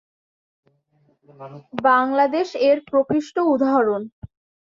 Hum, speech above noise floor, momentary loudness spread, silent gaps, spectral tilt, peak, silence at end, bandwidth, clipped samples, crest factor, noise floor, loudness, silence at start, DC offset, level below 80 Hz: none; 43 dB; 17 LU; 4.12-4.22 s; -6 dB/octave; -4 dBFS; 0.45 s; 7.4 kHz; under 0.1%; 18 dB; -63 dBFS; -19 LUFS; 1.4 s; under 0.1%; -60 dBFS